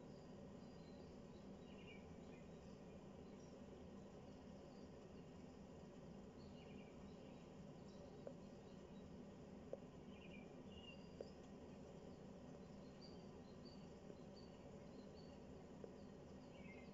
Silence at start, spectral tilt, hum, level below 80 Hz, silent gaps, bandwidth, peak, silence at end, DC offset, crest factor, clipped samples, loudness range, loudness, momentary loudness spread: 0 s; -6 dB/octave; none; -74 dBFS; none; 7.4 kHz; -36 dBFS; 0 s; under 0.1%; 22 dB; under 0.1%; 1 LU; -60 LUFS; 2 LU